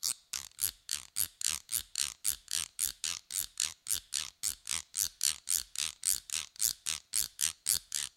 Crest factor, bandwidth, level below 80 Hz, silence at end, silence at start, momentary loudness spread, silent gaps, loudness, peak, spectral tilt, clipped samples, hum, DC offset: 28 dB; 17 kHz; -64 dBFS; 0.1 s; 0 s; 6 LU; none; -33 LUFS; -8 dBFS; 2.5 dB/octave; under 0.1%; none; under 0.1%